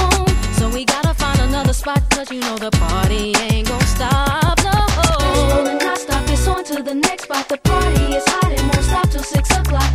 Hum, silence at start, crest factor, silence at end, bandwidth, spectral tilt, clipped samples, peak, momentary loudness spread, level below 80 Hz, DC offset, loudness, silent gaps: none; 0 s; 16 dB; 0 s; 16 kHz; -4.5 dB/octave; under 0.1%; 0 dBFS; 4 LU; -20 dBFS; under 0.1%; -17 LUFS; none